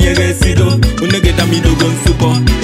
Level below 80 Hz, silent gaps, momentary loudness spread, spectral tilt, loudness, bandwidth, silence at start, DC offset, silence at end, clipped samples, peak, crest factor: -16 dBFS; none; 1 LU; -5.5 dB/octave; -11 LUFS; 16 kHz; 0 s; under 0.1%; 0 s; under 0.1%; 0 dBFS; 10 dB